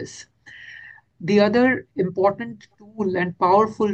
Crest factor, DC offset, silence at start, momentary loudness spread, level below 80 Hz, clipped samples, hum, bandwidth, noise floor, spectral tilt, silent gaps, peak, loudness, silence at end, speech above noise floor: 18 dB; under 0.1%; 0 s; 22 LU; -60 dBFS; under 0.1%; none; 8.6 kHz; -44 dBFS; -6.5 dB/octave; none; -4 dBFS; -20 LUFS; 0 s; 24 dB